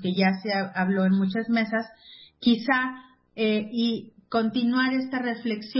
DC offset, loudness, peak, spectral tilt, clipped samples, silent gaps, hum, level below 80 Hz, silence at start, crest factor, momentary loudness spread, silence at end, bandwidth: under 0.1%; -25 LUFS; -10 dBFS; -10 dB/octave; under 0.1%; none; none; -70 dBFS; 0 s; 16 dB; 8 LU; 0 s; 5.8 kHz